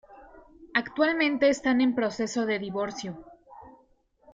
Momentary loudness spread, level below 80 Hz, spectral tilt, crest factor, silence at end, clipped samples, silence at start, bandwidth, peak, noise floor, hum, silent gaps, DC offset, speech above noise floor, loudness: 12 LU; -64 dBFS; -4.5 dB/octave; 18 dB; 0.6 s; under 0.1%; 0.1 s; 7.8 kHz; -10 dBFS; -64 dBFS; none; none; under 0.1%; 38 dB; -26 LUFS